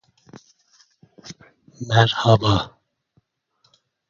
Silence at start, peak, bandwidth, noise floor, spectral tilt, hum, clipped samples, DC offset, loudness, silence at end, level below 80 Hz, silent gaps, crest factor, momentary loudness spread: 0.35 s; 0 dBFS; 7.4 kHz; -66 dBFS; -6 dB/octave; none; under 0.1%; under 0.1%; -18 LUFS; 1.4 s; -46 dBFS; none; 24 dB; 25 LU